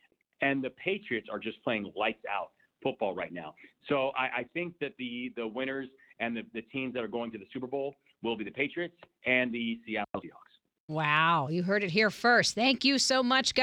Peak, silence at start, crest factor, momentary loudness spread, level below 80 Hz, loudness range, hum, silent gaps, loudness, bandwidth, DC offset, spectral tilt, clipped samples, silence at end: -10 dBFS; 0.4 s; 22 dB; 14 LU; -72 dBFS; 9 LU; none; 10.80-10.88 s; -31 LUFS; 15 kHz; under 0.1%; -3.5 dB/octave; under 0.1%; 0 s